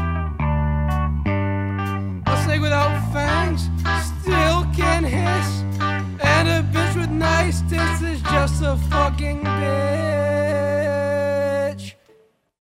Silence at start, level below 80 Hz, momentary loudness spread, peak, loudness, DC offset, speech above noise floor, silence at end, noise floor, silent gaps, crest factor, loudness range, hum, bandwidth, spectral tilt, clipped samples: 0 s; -28 dBFS; 5 LU; -2 dBFS; -20 LUFS; under 0.1%; 36 dB; 0.75 s; -56 dBFS; none; 18 dB; 2 LU; none; 15 kHz; -6 dB/octave; under 0.1%